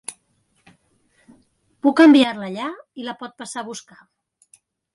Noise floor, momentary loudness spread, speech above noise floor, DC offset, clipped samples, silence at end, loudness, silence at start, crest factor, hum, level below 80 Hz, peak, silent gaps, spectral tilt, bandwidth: -66 dBFS; 22 LU; 47 dB; under 0.1%; under 0.1%; 1.15 s; -18 LUFS; 0.1 s; 18 dB; none; -72 dBFS; -4 dBFS; none; -4 dB/octave; 11.5 kHz